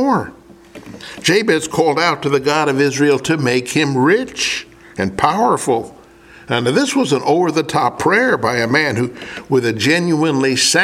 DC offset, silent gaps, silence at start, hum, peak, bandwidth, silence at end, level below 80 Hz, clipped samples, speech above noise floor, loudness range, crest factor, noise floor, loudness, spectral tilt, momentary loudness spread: under 0.1%; none; 0 s; none; 0 dBFS; 16 kHz; 0 s; -52 dBFS; under 0.1%; 27 dB; 2 LU; 16 dB; -42 dBFS; -15 LUFS; -4 dB/octave; 9 LU